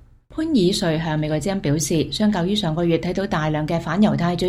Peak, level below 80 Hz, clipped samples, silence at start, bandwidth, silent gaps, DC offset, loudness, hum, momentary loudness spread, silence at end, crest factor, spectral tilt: -4 dBFS; -42 dBFS; under 0.1%; 0.3 s; 15.5 kHz; none; under 0.1%; -21 LUFS; none; 4 LU; 0 s; 16 dB; -5.5 dB/octave